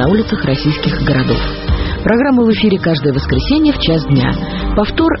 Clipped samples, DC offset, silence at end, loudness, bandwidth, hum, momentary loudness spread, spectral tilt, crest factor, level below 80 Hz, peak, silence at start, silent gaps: under 0.1%; under 0.1%; 0 s; -14 LUFS; 6 kHz; none; 6 LU; -5.5 dB/octave; 12 dB; -24 dBFS; 0 dBFS; 0 s; none